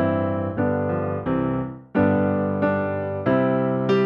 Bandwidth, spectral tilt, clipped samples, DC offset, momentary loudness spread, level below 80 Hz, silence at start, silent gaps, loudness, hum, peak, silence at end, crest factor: 6.6 kHz; -9.5 dB/octave; under 0.1%; under 0.1%; 5 LU; -52 dBFS; 0 s; none; -23 LUFS; none; -8 dBFS; 0 s; 14 dB